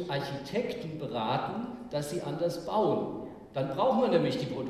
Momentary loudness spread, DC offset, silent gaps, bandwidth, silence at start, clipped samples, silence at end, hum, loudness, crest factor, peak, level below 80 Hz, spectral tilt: 10 LU; under 0.1%; none; 14.5 kHz; 0 s; under 0.1%; 0 s; none; -31 LUFS; 18 dB; -14 dBFS; -62 dBFS; -6.5 dB/octave